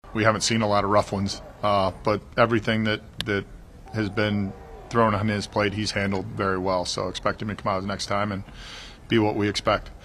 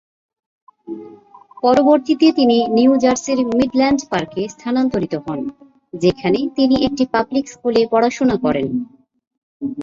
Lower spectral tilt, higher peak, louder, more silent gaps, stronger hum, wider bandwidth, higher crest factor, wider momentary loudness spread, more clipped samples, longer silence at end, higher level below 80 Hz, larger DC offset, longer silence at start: about the same, -5 dB/octave vs -5.5 dB/octave; about the same, -2 dBFS vs -2 dBFS; second, -25 LUFS vs -17 LUFS; second, none vs 9.27-9.31 s, 9.38-9.60 s; neither; first, 13 kHz vs 7.6 kHz; first, 22 dB vs 16 dB; second, 9 LU vs 14 LU; neither; about the same, 0 s vs 0 s; about the same, -46 dBFS vs -50 dBFS; neither; second, 0.05 s vs 0.9 s